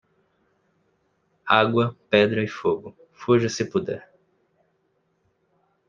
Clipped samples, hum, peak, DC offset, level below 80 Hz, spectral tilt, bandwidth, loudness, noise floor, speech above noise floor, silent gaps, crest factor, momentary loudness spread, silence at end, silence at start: under 0.1%; none; -2 dBFS; under 0.1%; -66 dBFS; -5.5 dB/octave; 7.4 kHz; -22 LUFS; -70 dBFS; 48 dB; none; 24 dB; 16 LU; 1.9 s; 1.45 s